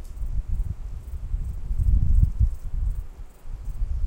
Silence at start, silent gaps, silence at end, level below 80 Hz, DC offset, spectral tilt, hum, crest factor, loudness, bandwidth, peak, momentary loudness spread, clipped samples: 0 s; none; 0 s; -24 dBFS; under 0.1%; -8.5 dB/octave; none; 18 dB; -29 LUFS; 8.2 kHz; -6 dBFS; 17 LU; under 0.1%